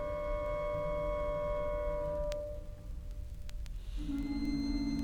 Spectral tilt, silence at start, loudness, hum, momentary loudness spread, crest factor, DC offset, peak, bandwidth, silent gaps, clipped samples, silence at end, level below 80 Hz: -7 dB/octave; 0 s; -38 LUFS; none; 12 LU; 16 dB; under 0.1%; -22 dBFS; 17 kHz; none; under 0.1%; 0 s; -42 dBFS